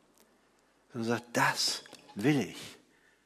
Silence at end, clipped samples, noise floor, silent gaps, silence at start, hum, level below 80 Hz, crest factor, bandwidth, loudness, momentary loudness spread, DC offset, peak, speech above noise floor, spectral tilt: 0.5 s; under 0.1%; -68 dBFS; none; 0.95 s; none; -74 dBFS; 20 dB; 16 kHz; -31 LUFS; 18 LU; under 0.1%; -14 dBFS; 37 dB; -3.5 dB/octave